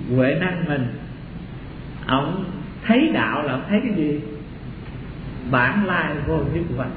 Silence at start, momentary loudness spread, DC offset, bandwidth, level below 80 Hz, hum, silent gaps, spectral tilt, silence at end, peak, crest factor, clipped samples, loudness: 0 s; 17 LU; under 0.1%; 4.9 kHz; -40 dBFS; none; none; -10.5 dB/octave; 0 s; -4 dBFS; 20 dB; under 0.1%; -22 LUFS